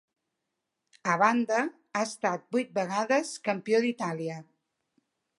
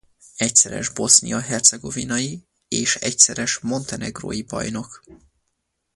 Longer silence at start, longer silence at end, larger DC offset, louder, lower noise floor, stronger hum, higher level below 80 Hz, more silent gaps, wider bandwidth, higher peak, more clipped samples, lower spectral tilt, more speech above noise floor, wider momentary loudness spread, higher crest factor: first, 1.05 s vs 0.35 s; first, 0.95 s vs 0.8 s; neither; second, -29 LUFS vs -18 LUFS; first, -84 dBFS vs -75 dBFS; neither; second, -82 dBFS vs -52 dBFS; neither; about the same, 11.5 kHz vs 11.5 kHz; second, -8 dBFS vs 0 dBFS; neither; first, -4.5 dB/octave vs -1.5 dB/octave; about the same, 56 dB vs 53 dB; second, 10 LU vs 15 LU; about the same, 22 dB vs 22 dB